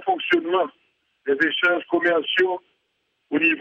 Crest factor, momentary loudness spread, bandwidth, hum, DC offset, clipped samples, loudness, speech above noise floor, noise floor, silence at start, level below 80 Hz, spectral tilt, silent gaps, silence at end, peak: 16 dB; 9 LU; 6.8 kHz; none; under 0.1%; under 0.1%; -21 LUFS; 51 dB; -72 dBFS; 0 s; -74 dBFS; -5 dB/octave; none; 0 s; -8 dBFS